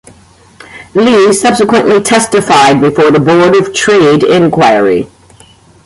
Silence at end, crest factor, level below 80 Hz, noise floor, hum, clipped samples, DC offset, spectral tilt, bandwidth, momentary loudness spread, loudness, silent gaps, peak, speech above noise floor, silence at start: 0.8 s; 8 dB; -44 dBFS; -40 dBFS; none; under 0.1%; under 0.1%; -4.5 dB/octave; 11.5 kHz; 4 LU; -7 LUFS; none; 0 dBFS; 34 dB; 0.75 s